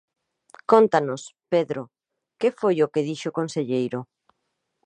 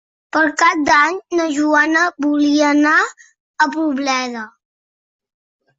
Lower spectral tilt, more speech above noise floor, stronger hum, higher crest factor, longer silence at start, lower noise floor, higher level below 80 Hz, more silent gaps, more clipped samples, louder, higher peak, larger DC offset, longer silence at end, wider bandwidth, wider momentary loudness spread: first, -6 dB/octave vs -2 dB/octave; second, 55 dB vs over 75 dB; neither; first, 24 dB vs 14 dB; first, 0.7 s vs 0.35 s; second, -78 dBFS vs under -90 dBFS; second, -74 dBFS vs -60 dBFS; second, none vs 3.40-3.54 s; neither; second, -23 LUFS vs -15 LUFS; about the same, -2 dBFS vs -2 dBFS; neither; second, 0.8 s vs 1.3 s; first, 9.4 kHz vs 8 kHz; first, 16 LU vs 9 LU